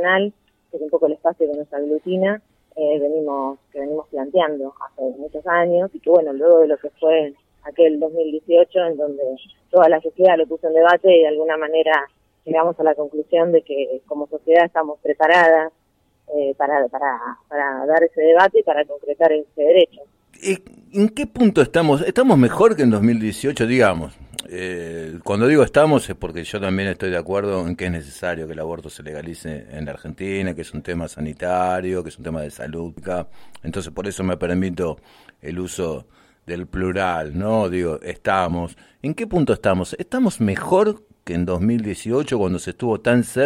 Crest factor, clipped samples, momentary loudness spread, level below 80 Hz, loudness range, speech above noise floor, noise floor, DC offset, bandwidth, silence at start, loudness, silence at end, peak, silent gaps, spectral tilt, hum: 18 dB; under 0.1%; 16 LU; -50 dBFS; 10 LU; 44 dB; -62 dBFS; under 0.1%; 14.5 kHz; 0 s; -19 LUFS; 0 s; -2 dBFS; none; -6 dB/octave; none